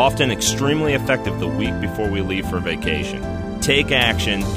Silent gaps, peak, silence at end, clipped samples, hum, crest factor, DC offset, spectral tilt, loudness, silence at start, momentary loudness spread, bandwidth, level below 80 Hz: none; -2 dBFS; 0 s; under 0.1%; none; 16 dB; under 0.1%; -4 dB/octave; -19 LUFS; 0 s; 7 LU; 15.5 kHz; -34 dBFS